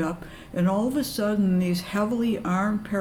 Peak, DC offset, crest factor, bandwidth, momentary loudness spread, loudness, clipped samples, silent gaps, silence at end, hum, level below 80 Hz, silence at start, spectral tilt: -14 dBFS; under 0.1%; 10 dB; 18 kHz; 5 LU; -25 LUFS; under 0.1%; none; 0 s; none; -50 dBFS; 0 s; -6.5 dB/octave